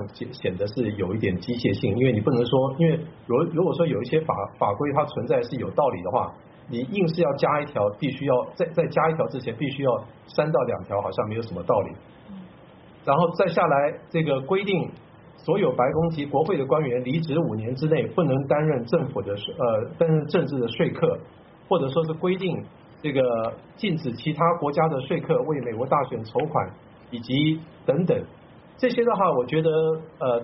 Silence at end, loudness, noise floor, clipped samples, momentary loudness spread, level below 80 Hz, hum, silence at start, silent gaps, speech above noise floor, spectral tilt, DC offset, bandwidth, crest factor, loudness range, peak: 0 s; -24 LUFS; -48 dBFS; under 0.1%; 8 LU; -58 dBFS; none; 0 s; none; 25 dB; -6 dB/octave; under 0.1%; 5.8 kHz; 18 dB; 3 LU; -6 dBFS